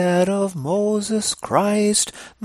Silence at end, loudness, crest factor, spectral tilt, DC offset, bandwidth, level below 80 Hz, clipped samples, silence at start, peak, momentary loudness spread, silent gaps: 0 s; -20 LUFS; 18 dB; -4 dB/octave; under 0.1%; 15.5 kHz; -58 dBFS; under 0.1%; 0 s; -2 dBFS; 5 LU; none